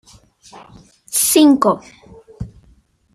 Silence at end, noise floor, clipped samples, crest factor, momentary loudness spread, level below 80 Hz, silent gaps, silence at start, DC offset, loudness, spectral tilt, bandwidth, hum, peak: 0.65 s; -53 dBFS; under 0.1%; 18 dB; 23 LU; -48 dBFS; none; 1.1 s; under 0.1%; -14 LUFS; -3.5 dB/octave; 15 kHz; none; 0 dBFS